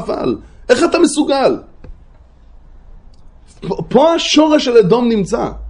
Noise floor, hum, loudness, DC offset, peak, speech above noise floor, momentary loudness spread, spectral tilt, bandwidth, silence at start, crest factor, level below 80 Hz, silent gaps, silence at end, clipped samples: -42 dBFS; none; -13 LUFS; under 0.1%; 0 dBFS; 29 dB; 13 LU; -4.5 dB/octave; 11 kHz; 0 s; 14 dB; -38 dBFS; none; 0 s; under 0.1%